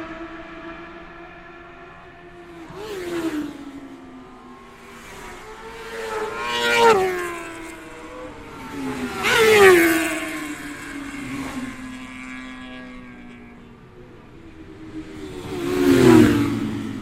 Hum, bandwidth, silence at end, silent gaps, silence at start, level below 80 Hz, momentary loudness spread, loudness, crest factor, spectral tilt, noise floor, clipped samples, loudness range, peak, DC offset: none; 16 kHz; 0 s; none; 0 s; -48 dBFS; 27 LU; -19 LUFS; 22 dB; -4.5 dB/octave; -44 dBFS; under 0.1%; 17 LU; 0 dBFS; under 0.1%